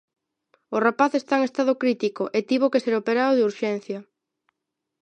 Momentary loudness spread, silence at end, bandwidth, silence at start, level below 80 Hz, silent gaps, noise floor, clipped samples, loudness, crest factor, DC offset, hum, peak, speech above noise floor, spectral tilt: 8 LU; 1 s; 8.8 kHz; 0.7 s; -78 dBFS; none; -83 dBFS; under 0.1%; -23 LUFS; 20 dB; under 0.1%; none; -4 dBFS; 61 dB; -5.5 dB/octave